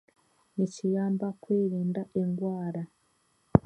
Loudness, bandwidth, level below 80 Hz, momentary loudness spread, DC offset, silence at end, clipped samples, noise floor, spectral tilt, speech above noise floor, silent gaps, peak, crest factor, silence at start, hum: -31 LUFS; 9 kHz; -52 dBFS; 9 LU; under 0.1%; 0.05 s; under 0.1%; -70 dBFS; -9 dB/octave; 41 dB; none; -2 dBFS; 28 dB; 0.55 s; none